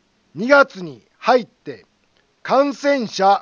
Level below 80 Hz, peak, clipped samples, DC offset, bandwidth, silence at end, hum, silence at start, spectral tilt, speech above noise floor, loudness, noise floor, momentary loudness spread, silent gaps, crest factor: -72 dBFS; 0 dBFS; under 0.1%; under 0.1%; 7.4 kHz; 0 s; none; 0.35 s; -4.5 dB/octave; 44 dB; -17 LUFS; -61 dBFS; 22 LU; none; 18 dB